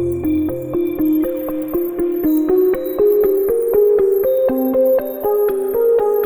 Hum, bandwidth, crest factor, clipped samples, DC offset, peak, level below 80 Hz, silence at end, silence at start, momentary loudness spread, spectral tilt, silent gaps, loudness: none; over 20 kHz; 12 dB; under 0.1%; 0.1%; -4 dBFS; -44 dBFS; 0 s; 0 s; 7 LU; -8 dB/octave; none; -16 LUFS